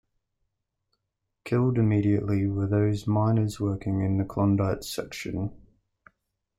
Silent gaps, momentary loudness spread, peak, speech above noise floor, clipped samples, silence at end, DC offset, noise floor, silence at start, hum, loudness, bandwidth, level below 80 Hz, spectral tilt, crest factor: none; 10 LU; -12 dBFS; 57 dB; under 0.1%; 1 s; under 0.1%; -81 dBFS; 1.45 s; none; -26 LUFS; 15 kHz; -52 dBFS; -7.5 dB/octave; 14 dB